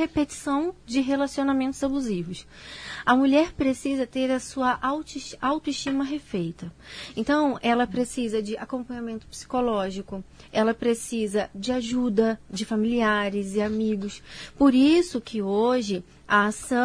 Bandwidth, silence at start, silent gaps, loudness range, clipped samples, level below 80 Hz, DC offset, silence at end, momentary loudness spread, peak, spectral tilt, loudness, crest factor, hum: 11 kHz; 0 s; none; 5 LU; under 0.1%; -52 dBFS; under 0.1%; 0 s; 14 LU; -6 dBFS; -5 dB/octave; -25 LUFS; 18 dB; none